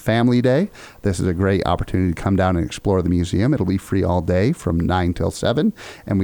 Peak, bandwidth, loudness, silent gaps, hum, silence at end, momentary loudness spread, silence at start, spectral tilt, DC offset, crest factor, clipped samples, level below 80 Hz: -4 dBFS; 19 kHz; -20 LUFS; none; none; 0 s; 5 LU; 0 s; -7 dB/octave; under 0.1%; 16 dB; under 0.1%; -36 dBFS